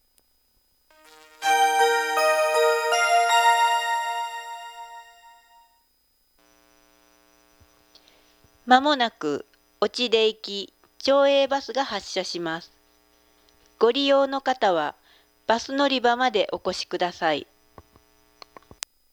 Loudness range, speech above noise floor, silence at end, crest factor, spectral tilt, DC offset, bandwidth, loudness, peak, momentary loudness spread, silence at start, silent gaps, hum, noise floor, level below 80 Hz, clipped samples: 6 LU; 44 dB; 1.7 s; 24 dB; -2 dB/octave; under 0.1%; over 20 kHz; -22 LUFS; -2 dBFS; 15 LU; 1.4 s; none; none; -66 dBFS; -68 dBFS; under 0.1%